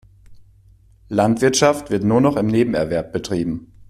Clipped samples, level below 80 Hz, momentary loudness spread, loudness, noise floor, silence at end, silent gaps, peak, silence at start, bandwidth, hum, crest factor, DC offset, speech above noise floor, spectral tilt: under 0.1%; -46 dBFS; 8 LU; -18 LUFS; -50 dBFS; 0.05 s; none; -2 dBFS; 0.3 s; 14.5 kHz; none; 16 dB; under 0.1%; 33 dB; -5.5 dB/octave